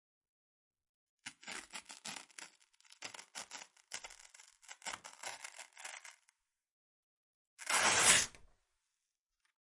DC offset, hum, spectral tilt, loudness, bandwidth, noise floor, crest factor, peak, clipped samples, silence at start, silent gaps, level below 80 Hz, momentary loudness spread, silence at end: under 0.1%; none; 0.5 dB/octave; -33 LUFS; 11.5 kHz; -89 dBFS; 30 dB; -12 dBFS; under 0.1%; 1.25 s; 6.69-7.57 s; -74 dBFS; 26 LU; 1.3 s